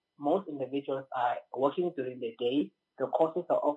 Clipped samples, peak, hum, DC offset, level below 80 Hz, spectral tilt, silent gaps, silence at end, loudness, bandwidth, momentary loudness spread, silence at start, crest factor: under 0.1%; -12 dBFS; none; under 0.1%; under -90 dBFS; -8 dB/octave; none; 0 s; -32 LUFS; 7.8 kHz; 7 LU; 0.2 s; 20 dB